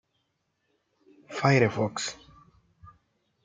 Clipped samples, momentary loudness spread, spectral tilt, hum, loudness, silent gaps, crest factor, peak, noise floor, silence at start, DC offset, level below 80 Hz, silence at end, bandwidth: under 0.1%; 17 LU; -5.5 dB/octave; none; -26 LUFS; none; 24 dB; -6 dBFS; -77 dBFS; 1.3 s; under 0.1%; -66 dBFS; 0.6 s; 9.4 kHz